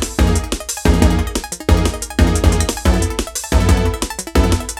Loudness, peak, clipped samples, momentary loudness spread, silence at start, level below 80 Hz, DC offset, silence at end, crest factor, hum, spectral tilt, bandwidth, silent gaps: -17 LUFS; 0 dBFS; under 0.1%; 7 LU; 0 s; -18 dBFS; under 0.1%; 0 s; 14 dB; none; -5 dB/octave; 17 kHz; none